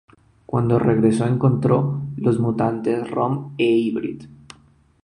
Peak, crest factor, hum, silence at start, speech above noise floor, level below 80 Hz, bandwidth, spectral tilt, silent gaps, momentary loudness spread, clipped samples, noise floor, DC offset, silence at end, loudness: -4 dBFS; 16 dB; none; 0.5 s; 35 dB; -52 dBFS; 11 kHz; -8.5 dB/octave; none; 8 LU; under 0.1%; -54 dBFS; under 0.1%; 0.7 s; -20 LUFS